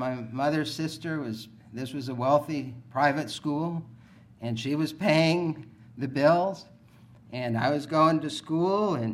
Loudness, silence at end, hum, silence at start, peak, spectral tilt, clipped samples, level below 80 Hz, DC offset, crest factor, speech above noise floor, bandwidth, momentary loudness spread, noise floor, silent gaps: -27 LUFS; 0 s; none; 0 s; -8 dBFS; -6 dB/octave; under 0.1%; -68 dBFS; under 0.1%; 18 dB; 27 dB; 15 kHz; 15 LU; -54 dBFS; none